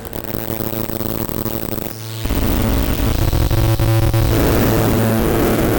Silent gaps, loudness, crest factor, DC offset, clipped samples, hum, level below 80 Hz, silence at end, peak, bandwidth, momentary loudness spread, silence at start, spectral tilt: none; -17 LUFS; 12 dB; under 0.1%; under 0.1%; none; -22 dBFS; 0 s; -6 dBFS; over 20 kHz; 8 LU; 0 s; -6 dB/octave